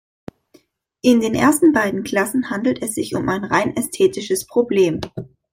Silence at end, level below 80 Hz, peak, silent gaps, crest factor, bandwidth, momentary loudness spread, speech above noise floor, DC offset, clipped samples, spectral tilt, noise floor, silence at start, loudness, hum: 0.25 s; -52 dBFS; -2 dBFS; none; 16 dB; 16.5 kHz; 8 LU; 37 dB; under 0.1%; under 0.1%; -4.5 dB/octave; -55 dBFS; 1.05 s; -18 LUFS; none